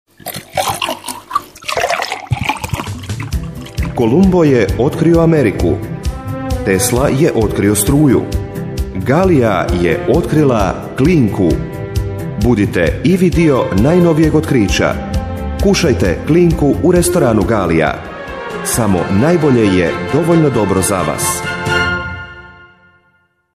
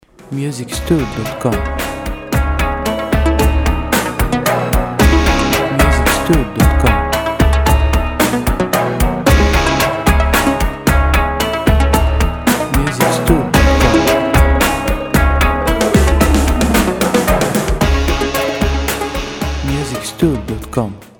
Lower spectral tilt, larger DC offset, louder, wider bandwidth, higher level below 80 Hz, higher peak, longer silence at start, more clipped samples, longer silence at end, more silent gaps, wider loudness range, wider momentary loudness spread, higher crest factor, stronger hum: about the same, -6 dB/octave vs -5 dB/octave; neither; about the same, -13 LUFS vs -14 LUFS; second, 15.5 kHz vs 19 kHz; second, -26 dBFS vs -18 dBFS; about the same, 0 dBFS vs 0 dBFS; about the same, 0.25 s vs 0.25 s; neither; first, 1.05 s vs 0.15 s; neither; about the same, 3 LU vs 4 LU; first, 11 LU vs 8 LU; about the same, 12 dB vs 14 dB; neither